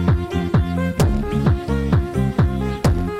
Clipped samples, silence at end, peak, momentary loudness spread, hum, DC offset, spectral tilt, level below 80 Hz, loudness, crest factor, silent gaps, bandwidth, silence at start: under 0.1%; 0 s; -6 dBFS; 2 LU; none; 0.3%; -7.5 dB/octave; -26 dBFS; -20 LUFS; 12 dB; none; 15.5 kHz; 0 s